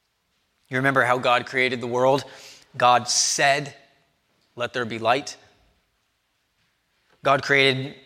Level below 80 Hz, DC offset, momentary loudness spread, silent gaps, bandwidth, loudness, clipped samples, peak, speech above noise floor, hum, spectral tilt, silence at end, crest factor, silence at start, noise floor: -70 dBFS; under 0.1%; 12 LU; none; 16 kHz; -21 LUFS; under 0.1%; -4 dBFS; 50 dB; none; -2.5 dB/octave; 0.1 s; 20 dB; 0.7 s; -71 dBFS